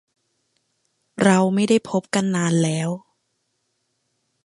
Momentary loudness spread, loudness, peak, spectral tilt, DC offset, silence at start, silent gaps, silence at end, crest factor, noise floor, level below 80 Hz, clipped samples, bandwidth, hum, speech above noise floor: 11 LU; -20 LUFS; -2 dBFS; -5.5 dB/octave; under 0.1%; 1.2 s; none; 1.5 s; 22 dB; -73 dBFS; -66 dBFS; under 0.1%; 11.5 kHz; none; 54 dB